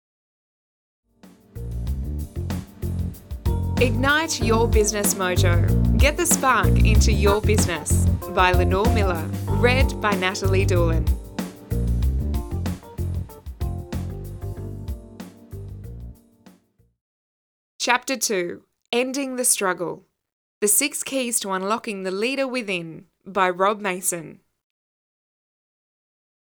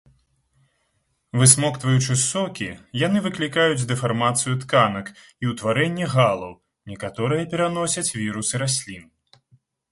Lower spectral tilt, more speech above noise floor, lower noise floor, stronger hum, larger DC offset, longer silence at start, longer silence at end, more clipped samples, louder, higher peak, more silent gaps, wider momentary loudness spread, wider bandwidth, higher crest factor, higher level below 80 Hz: about the same, -4.5 dB/octave vs -4 dB/octave; second, 39 dB vs 49 dB; second, -59 dBFS vs -70 dBFS; neither; neither; first, 1.55 s vs 1.35 s; first, 2.2 s vs 0.9 s; neither; about the same, -22 LUFS vs -21 LUFS; about the same, -2 dBFS vs 0 dBFS; first, 17.01-17.79 s, 20.32-20.61 s vs none; about the same, 16 LU vs 15 LU; first, over 20 kHz vs 11.5 kHz; about the same, 22 dB vs 22 dB; first, -28 dBFS vs -56 dBFS